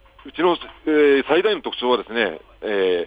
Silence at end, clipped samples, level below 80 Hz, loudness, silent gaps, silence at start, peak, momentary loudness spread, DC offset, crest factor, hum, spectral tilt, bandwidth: 0 s; under 0.1%; -54 dBFS; -20 LUFS; none; 0.25 s; -4 dBFS; 9 LU; under 0.1%; 16 dB; none; -6.5 dB/octave; 5 kHz